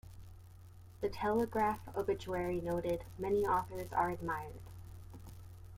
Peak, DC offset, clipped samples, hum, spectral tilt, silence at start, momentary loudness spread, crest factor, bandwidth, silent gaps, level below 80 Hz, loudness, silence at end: -20 dBFS; under 0.1%; under 0.1%; none; -7 dB/octave; 0.05 s; 22 LU; 18 dB; 16.5 kHz; none; -56 dBFS; -36 LUFS; 0 s